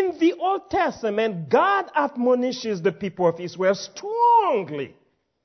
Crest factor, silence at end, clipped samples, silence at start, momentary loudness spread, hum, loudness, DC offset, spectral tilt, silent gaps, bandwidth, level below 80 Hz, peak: 16 dB; 0.55 s; under 0.1%; 0 s; 8 LU; none; -22 LUFS; under 0.1%; -5.5 dB/octave; none; 6.4 kHz; -62 dBFS; -6 dBFS